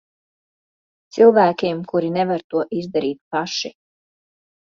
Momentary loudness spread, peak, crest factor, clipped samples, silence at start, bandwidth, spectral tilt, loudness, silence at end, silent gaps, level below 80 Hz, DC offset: 12 LU; -2 dBFS; 18 dB; under 0.1%; 1.15 s; 7.4 kHz; -5.5 dB/octave; -19 LUFS; 1.05 s; 2.44-2.50 s, 3.21-3.31 s; -66 dBFS; under 0.1%